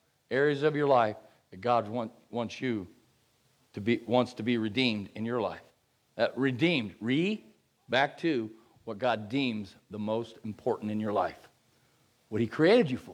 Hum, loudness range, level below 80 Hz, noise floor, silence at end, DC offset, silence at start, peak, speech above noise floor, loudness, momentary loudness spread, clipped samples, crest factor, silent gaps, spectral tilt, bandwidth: none; 3 LU; -74 dBFS; -69 dBFS; 0 s; under 0.1%; 0.3 s; -12 dBFS; 39 dB; -30 LUFS; 14 LU; under 0.1%; 18 dB; none; -6.5 dB/octave; 11 kHz